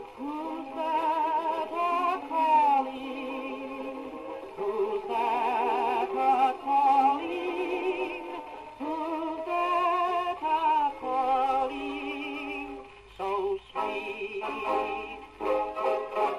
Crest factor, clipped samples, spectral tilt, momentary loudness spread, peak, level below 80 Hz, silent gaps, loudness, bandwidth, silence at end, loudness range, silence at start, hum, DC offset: 16 dB; under 0.1%; -4.5 dB/octave; 13 LU; -14 dBFS; -62 dBFS; none; -29 LUFS; 13 kHz; 0 s; 6 LU; 0 s; none; under 0.1%